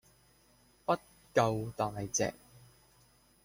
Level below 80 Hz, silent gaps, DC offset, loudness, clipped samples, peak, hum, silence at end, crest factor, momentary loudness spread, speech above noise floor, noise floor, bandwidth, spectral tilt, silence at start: -64 dBFS; none; under 0.1%; -34 LUFS; under 0.1%; -14 dBFS; none; 0.85 s; 22 dB; 6 LU; 34 dB; -66 dBFS; 16.5 kHz; -4.5 dB/octave; 0.9 s